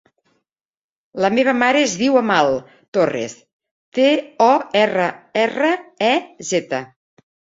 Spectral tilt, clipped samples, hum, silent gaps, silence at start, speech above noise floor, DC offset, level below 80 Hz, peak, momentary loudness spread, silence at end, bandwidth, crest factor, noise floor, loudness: -4 dB/octave; under 0.1%; none; 2.88-2.92 s, 3.53-3.60 s, 3.71-3.92 s; 1.15 s; 56 dB; under 0.1%; -62 dBFS; -2 dBFS; 11 LU; 0.7 s; 7.8 kHz; 18 dB; -73 dBFS; -18 LUFS